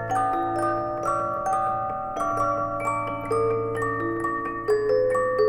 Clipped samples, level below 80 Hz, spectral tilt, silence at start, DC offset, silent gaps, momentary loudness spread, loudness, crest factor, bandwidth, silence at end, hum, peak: under 0.1%; -50 dBFS; -6.5 dB/octave; 0 s; under 0.1%; none; 5 LU; -25 LUFS; 14 dB; 16 kHz; 0 s; none; -12 dBFS